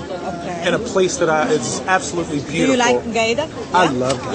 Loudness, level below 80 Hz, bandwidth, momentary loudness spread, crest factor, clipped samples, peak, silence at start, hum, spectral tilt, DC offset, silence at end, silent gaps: -18 LUFS; -46 dBFS; 8.8 kHz; 7 LU; 18 dB; under 0.1%; 0 dBFS; 0 s; none; -4 dB/octave; under 0.1%; 0 s; none